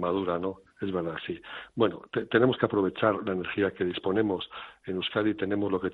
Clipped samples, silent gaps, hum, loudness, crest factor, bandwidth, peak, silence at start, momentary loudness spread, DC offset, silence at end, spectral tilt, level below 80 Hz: under 0.1%; none; none; -29 LUFS; 22 dB; 4.5 kHz; -6 dBFS; 0 s; 12 LU; under 0.1%; 0 s; -9 dB/octave; -64 dBFS